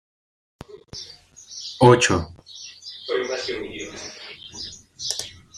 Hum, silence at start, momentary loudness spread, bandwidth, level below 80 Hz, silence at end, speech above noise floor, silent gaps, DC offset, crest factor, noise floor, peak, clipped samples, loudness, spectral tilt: none; 0.7 s; 22 LU; 14.5 kHz; -54 dBFS; 0 s; 24 dB; none; under 0.1%; 24 dB; -42 dBFS; -2 dBFS; under 0.1%; -22 LUFS; -4.5 dB/octave